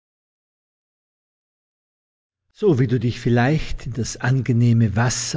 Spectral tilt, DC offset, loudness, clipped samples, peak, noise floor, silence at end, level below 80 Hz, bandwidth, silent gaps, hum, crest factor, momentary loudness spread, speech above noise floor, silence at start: -6 dB/octave; under 0.1%; -20 LUFS; under 0.1%; -6 dBFS; under -90 dBFS; 0 s; -40 dBFS; 8 kHz; none; none; 16 dB; 8 LU; over 71 dB; 2.6 s